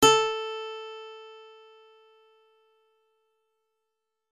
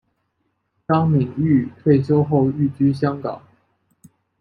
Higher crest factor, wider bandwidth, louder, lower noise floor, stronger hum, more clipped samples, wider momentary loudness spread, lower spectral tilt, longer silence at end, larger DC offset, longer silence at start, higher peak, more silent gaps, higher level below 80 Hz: first, 24 dB vs 16 dB; first, 13 kHz vs 5.6 kHz; second, -27 LUFS vs -19 LUFS; first, -84 dBFS vs -71 dBFS; neither; neither; first, 26 LU vs 12 LU; second, -2 dB/octave vs -10.5 dB/octave; first, 2.9 s vs 1 s; neither; second, 0 s vs 0.9 s; second, -8 dBFS vs -4 dBFS; neither; second, -64 dBFS vs -58 dBFS